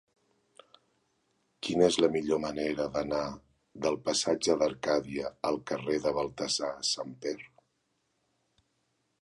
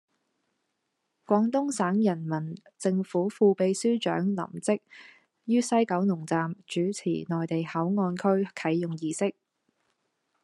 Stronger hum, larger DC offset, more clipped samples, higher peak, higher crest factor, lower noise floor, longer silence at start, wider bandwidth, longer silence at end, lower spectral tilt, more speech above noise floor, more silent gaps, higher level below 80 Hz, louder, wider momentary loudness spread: neither; neither; neither; about the same, -10 dBFS vs -10 dBFS; about the same, 22 dB vs 18 dB; about the same, -77 dBFS vs -80 dBFS; first, 1.65 s vs 1.3 s; about the same, 11.5 kHz vs 11.5 kHz; first, 1.75 s vs 1.1 s; second, -3.5 dB/octave vs -6 dB/octave; second, 47 dB vs 53 dB; neither; first, -62 dBFS vs -78 dBFS; second, -31 LUFS vs -28 LUFS; first, 11 LU vs 8 LU